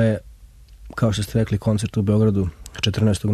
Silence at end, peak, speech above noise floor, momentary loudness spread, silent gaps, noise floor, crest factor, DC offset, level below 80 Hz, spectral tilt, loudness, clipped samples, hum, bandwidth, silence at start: 0 s; -6 dBFS; 26 dB; 8 LU; none; -45 dBFS; 14 dB; under 0.1%; -40 dBFS; -6.5 dB/octave; -21 LUFS; under 0.1%; none; 13.5 kHz; 0 s